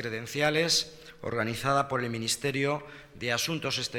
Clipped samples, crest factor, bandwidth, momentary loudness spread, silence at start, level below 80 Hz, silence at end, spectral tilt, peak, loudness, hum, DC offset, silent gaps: under 0.1%; 18 dB; 18.5 kHz; 11 LU; 0 s; -60 dBFS; 0 s; -3 dB/octave; -12 dBFS; -29 LUFS; none; under 0.1%; none